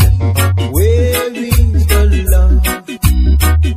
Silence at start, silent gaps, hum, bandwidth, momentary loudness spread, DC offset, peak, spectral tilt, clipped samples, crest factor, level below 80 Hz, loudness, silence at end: 0 s; none; none; 15.5 kHz; 4 LU; under 0.1%; 0 dBFS; -5.5 dB/octave; under 0.1%; 10 dB; -12 dBFS; -12 LUFS; 0 s